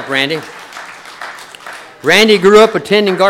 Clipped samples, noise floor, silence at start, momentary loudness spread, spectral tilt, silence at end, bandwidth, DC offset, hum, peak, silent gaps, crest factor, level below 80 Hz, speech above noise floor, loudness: 0.2%; -32 dBFS; 0 s; 23 LU; -4 dB/octave; 0 s; 16 kHz; under 0.1%; none; 0 dBFS; none; 12 dB; -50 dBFS; 22 dB; -10 LUFS